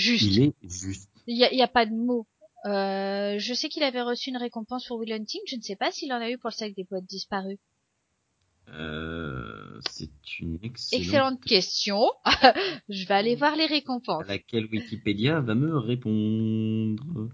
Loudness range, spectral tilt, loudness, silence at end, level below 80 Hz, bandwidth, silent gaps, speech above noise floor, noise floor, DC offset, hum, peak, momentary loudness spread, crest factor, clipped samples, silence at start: 13 LU; -5 dB/octave; -26 LUFS; 0 s; -54 dBFS; 7.8 kHz; none; 49 dB; -75 dBFS; under 0.1%; none; -2 dBFS; 13 LU; 24 dB; under 0.1%; 0 s